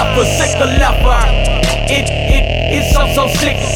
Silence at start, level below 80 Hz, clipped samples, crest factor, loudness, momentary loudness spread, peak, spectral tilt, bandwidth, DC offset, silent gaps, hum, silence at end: 0 s; -14 dBFS; under 0.1%; 12 dB; -13 LUFS; 2 LU; 0 dBFS; -4 dB/octave; 17 kHz; under 0.1%; none; none; 0 s